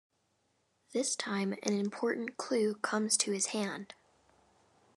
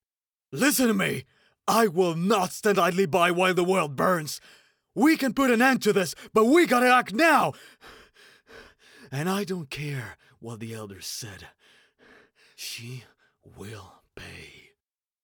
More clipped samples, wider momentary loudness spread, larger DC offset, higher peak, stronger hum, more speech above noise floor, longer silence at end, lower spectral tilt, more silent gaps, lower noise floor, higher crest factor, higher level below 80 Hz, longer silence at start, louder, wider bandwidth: neither; second, 9 LU vs 22 LU; neither; second, -14 dBFS vs -8 dBFS; neither; second, 43 dB vs over 66 dB; first, 1.05 s vs 0.75 s; second, -3 dB/octave vs -4.5 dB/octave; neither; second, -77 dBFS vs under -90 dBFS; about the same, 22 dB vs 18 dB; second, -86 dBFS vs -64 dBFS; first, 0.95 s vs 0.5 s; second, -33 LUFS vs -23 LUFS; second, 12.5 kHz vs over 20 kHz